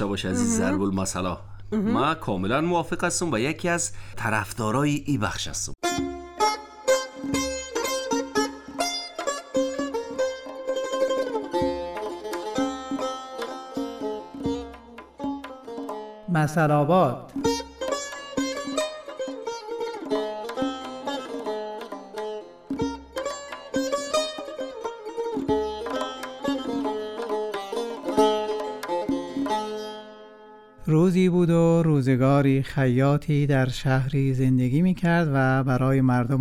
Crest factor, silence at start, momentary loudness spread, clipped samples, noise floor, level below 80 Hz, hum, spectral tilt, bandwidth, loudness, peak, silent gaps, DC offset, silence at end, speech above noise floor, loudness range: 18 dB; 0 s; 13 LU; under 0.1%; -48 dBFS; -48 dBFS; none; -5.5 dB/octave; 16 kHz; -26 LUFS; -8 dBFS; none; under 0.1%; 0 s; 25 dB; 9 LU